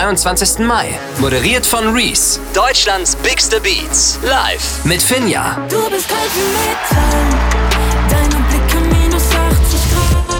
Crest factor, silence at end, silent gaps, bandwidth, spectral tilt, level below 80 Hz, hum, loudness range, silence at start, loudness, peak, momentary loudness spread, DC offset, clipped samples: 10 dB; 0 s; none; 20 kHz; -3 dB/octave; -18 dBFS; none; 2 LU; 0 s; -13 LUFS; -2 dBFS; 4 LU; under 0.1%; under 0.1%